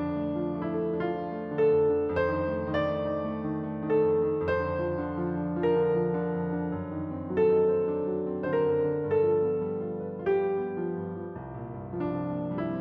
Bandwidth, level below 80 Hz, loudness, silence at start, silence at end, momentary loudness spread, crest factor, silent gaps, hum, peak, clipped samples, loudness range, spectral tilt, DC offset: 5.2 kHz; -56 dBFS; -29 LUFS; 0 s; 0 s; 9 LU; 14 dB; none; none; -16 dBFS; under 0.1%; 2 LU; -10.5 dB/octave; under 0.1%